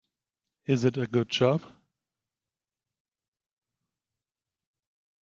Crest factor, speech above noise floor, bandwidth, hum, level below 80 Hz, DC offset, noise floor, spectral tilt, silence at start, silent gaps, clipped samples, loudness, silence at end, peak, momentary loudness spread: 22 dB; over 64 dB; 7.6 kHz; none; -72 dBFS; under 0.1%; under -90 dBFS; -6.5 dB/octave; 0.7 s; none; under 0.1%; -27 LUFS; 3.6 s; -10 dBFS; 7 LU